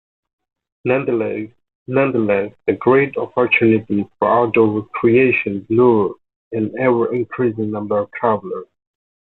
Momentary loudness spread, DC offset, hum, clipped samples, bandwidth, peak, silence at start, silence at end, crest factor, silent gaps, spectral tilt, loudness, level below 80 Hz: 10 LU; under 0.1%; none; under 0.1%; 4.1 kHz; -2 dBFS; 0.85 s; 0.75 s; 16 dB; 1.75-1.86 s, 6.36-6.51 s; -10.5 dB/octave; -17 LUFS; -56 dBFS